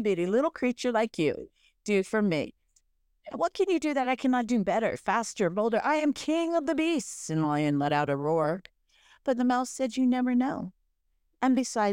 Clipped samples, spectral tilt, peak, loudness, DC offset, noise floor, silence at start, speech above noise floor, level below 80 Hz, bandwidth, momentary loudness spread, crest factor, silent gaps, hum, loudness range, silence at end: under 0.1%; -5.5 dB/octave; -14 dBFS; -28 LUFS; under 0.1%; -74 dBFS; 0 s; 47 dB; -66 dBFS; 15 kHz; 6 LU; 14 dB; none; none; 3 LU; 0 s